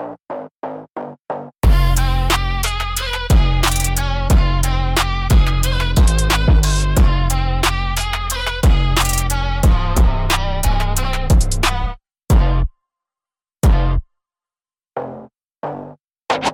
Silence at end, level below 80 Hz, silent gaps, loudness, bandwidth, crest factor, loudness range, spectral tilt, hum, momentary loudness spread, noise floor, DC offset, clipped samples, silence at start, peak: 0 s; -18 dBFS; 0.55-0.61 s, 0.91-0.95 s, 1.20-1.25 s; -17 LUFS; 17.5 kHz; 12 dB; 5 LU; -4.5 dB/octave; none; 14 LU; under -90 dBFS; under 0.1%; under 0.1%; 0 s; -4 dBFS